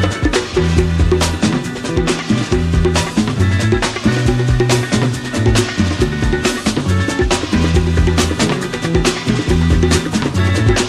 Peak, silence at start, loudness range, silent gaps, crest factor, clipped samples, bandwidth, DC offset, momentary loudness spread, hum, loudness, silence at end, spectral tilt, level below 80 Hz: 0 dBFS; 0 s; 1 LU; none; 14 dB; under 0.1%; 14 kHz; under 0.1%; 3 LU; none; -15 LUFS; 0 s; -5.5 dB/octave; -24 dBFS